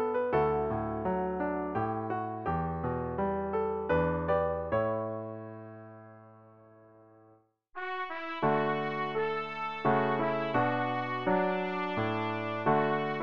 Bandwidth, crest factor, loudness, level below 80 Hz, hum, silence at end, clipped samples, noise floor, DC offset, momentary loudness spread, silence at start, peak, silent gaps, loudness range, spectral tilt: 6.6 kHz; 18 dB; -31 LUFS; -54 dBFS; none; 0 s; under 0.1%; -64 dBFS; under 0.1%; 9 LU; 0 s; -14 dBFS; none; 8 LU; -8.5 dB/octave